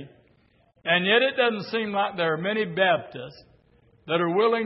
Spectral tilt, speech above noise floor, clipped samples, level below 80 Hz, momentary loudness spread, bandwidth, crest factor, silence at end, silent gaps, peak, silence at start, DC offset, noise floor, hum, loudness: -9 dB/octave; 38 dB; under 0.1%; -70 dBFS; 13 LU; 5.8 kHz; 18 dB; 0 s; none; -6 dBFS; 0 s; under 0.1%; -62 dBFS; none; -24 LUFS